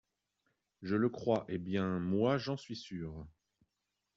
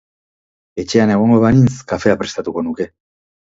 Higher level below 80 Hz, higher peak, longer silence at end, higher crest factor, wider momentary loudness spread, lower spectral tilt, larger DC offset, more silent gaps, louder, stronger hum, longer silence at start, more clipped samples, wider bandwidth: second, -66 dBFS vs -44 dBFS; second, -18 dBFS vs 0 dBFS; about the same, 0.85 s vs 0.75 s; about the same, 18 dB vs 16 dB; about the same, 13 LU vs 15 LU; about the same, -6 dB/octave vs -7 dB/octave; neither; neither; second, -35 LUFS vs -15 LUFS; neither; about the same, 0.8 s vs 0.75 s; neither; about the same, 7.6 kHz vs 7.8 kHz